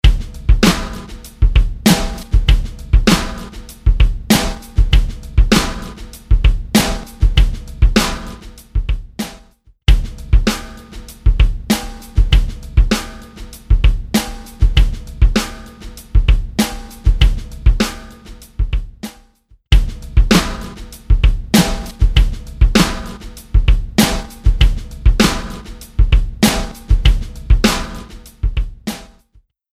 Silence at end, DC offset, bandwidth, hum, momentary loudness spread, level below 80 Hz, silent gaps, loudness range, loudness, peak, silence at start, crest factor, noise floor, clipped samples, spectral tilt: 0.7 s; under 0.1%; 15.5 kHz; none; 18 LU; -16 dBFS; none; 3 LU; -17 LUFS; 0 dBFS; 0.05 s; 14 dB; -53 dBFS; under 0.1%; -5 dB/octave